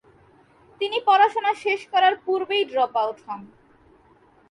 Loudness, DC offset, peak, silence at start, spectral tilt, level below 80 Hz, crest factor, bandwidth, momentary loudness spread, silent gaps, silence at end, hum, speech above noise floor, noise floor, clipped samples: -21 LUFS; under 0.1%; -6 dBFS; 0.8 s; -3 dB/octave; -70 dBFS; 18 dB; 11 kHz; 14 LU; none; 1.05 s; none; 35 dB; -56 dBFS; under 0.1%